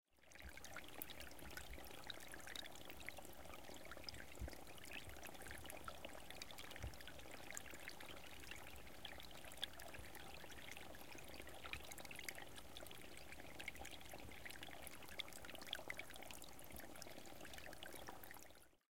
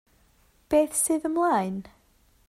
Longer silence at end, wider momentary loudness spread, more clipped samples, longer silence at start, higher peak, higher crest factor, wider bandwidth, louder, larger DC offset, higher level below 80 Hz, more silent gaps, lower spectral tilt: second, 0 s vs 0.6 s; second, 5 LU vs 8 LU; neither; second, 0 s vs 0.7 s; second, -28 dBFS vs -10 dBFS; first, 28 dB vs 16 dB; about the same, 17 kHz vs 15.5 kHz; second, -54 LUFS vs -25 LUFS; first, 0.2% vs under 0.1%; second, -66 dBFS vs -58 dBFS; neither; second, -2.5 dB/octave vs -4.5 dB/octave